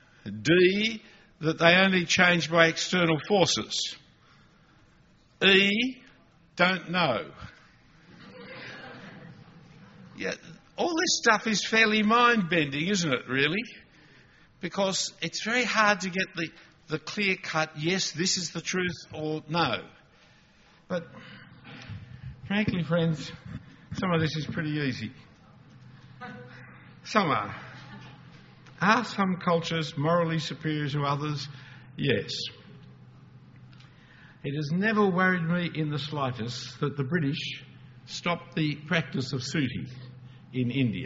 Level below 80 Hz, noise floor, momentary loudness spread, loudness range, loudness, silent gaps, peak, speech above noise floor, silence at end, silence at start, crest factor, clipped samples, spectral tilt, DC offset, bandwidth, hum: -62 dBFS; -60 dBFS; 23 LU; 10 LU; -26 LUFS; none; -4 dBFS; 33 dB; 0 s; 0.25 s; 24 dB; under 0.1%; -3 dB/octave; under 0.1%; 7.6 kHz; none